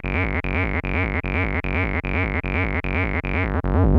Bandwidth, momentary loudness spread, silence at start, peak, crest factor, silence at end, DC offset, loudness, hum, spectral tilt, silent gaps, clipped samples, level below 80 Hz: 5.4 kHz; 0 LU; 0.05 s; -6 dBFS; 16 dB; 0 s; under 0.1%; -23 LUFS; none; -9 dB/octave; none; under 0.1%; -28 dBFS